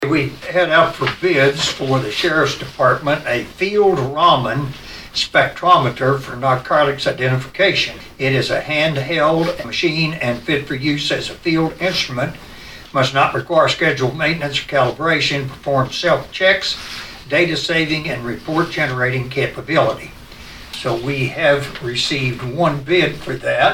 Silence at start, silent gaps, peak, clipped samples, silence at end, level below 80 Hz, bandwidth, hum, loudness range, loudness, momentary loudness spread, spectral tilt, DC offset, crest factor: 0 s; none; 0 dBFS; under 0.1%; 0 s; -44 dBFS; 16.5 kHz; none; 3 LU; -17 LUFS; 8 LU; -5 dB/octave; under 0.1%; 18 dB